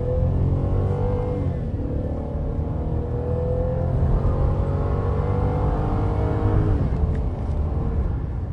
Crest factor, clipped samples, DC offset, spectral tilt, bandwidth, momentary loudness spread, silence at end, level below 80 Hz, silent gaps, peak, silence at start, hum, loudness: 14 dB; under 0.1%; under 0.1%; -10.5 dB/octave; 5 kHz; 5 LU; 0 s; -26 dBFS; none; -8 dBFS; 0 s; none; -24 LUFS